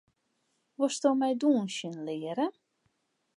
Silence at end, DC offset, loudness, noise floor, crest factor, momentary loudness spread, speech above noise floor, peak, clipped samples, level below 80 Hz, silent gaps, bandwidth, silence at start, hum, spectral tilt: 0.85 s; under 0.1%; -30 LUFS; -77 dBFS; 20 dB; 10 LU; 48 dB; -12 dBFS; under 0.1%; -88 dBFS; none; 11.5 kHz; 0.8 s; none; -4.5 dB/octave